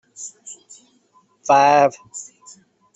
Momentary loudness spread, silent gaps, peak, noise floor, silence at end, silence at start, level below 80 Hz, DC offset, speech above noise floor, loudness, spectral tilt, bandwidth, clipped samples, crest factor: 26 LU; none; -2 dBFS; -58 dBFS; 0.75 s; 0.2 s; -70 dBFS; under 0.1%; 41 dB; -15 LUFS; -3.5 dB/octave; 8.2 kHz; under 0.1%; 18 dB